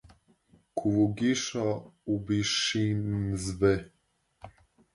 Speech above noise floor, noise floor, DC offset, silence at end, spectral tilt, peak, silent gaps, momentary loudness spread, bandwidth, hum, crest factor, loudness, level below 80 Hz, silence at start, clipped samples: 37 dB; -65 dBFS; under 0.1%; 0.45 s; -5 dB/octave; -12 dBFS; none; 7 LU; 11.5 kHz; none; 18 dB; -29 LUFS; -52 dBFS; 0.75 s; under 0.1%